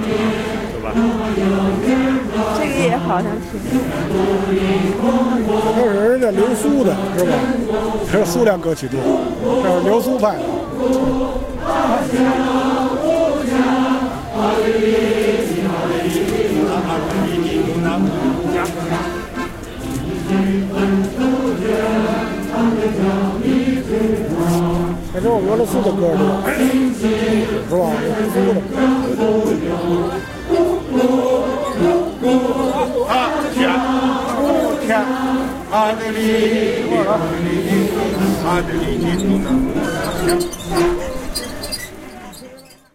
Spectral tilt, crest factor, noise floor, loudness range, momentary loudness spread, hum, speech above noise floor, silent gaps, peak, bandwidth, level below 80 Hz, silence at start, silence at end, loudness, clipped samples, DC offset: -6 dB/octave; 14 dB; -40 dBFS; 3 LU; 6 LU; none; 24 dB; none; -2 dBFS; 16 kHz; -36 dBFS; 0 s; 0.35 s; -17 LUFS; under 0.1%; under 0.1%